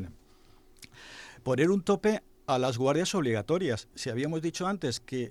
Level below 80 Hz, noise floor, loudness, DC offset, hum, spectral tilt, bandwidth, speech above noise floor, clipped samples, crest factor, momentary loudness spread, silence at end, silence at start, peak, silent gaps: -60 dBFS; -57 dBFS; -29 LUFS; under 0.1%; none; -5.5 dB/octave; 14.5 kHz; 29 dB; under 0.1%; 16 dB; 17 LU; 0 s; 0 s; -14 dBFS; none